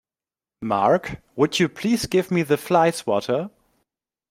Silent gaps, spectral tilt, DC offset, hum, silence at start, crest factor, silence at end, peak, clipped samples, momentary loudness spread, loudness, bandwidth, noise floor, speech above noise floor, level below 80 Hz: none; -5 dB/octave; under 0.1%; none; 0.6 s; 18 dB; 0.85 s; -4 dBFS; under 0.1%; 7 LU; -21 LUFS; 16 kHz; under -90 dBFS; over 69 dB; -54 dBFS